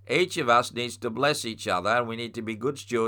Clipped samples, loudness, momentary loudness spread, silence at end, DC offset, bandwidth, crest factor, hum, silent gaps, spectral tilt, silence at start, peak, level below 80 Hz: under 0.1%; -26 LUFS; 9 LU; 0 s; under 0.1%; 19 kHz; 18 dB; none; none; -4 dB/octave; 0.05 s; -8 dBFS; -68 dBFS